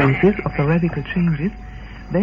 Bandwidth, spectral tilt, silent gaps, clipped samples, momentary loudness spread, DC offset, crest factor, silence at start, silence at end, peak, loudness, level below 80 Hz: 5.2 kHz; -9.5 dB/octave; none; under 0.1%; 19 LU; under 0.1%; 16 dB; 0 s; 0 s; -4 dBFS; -20 LUFS; -36 dBFS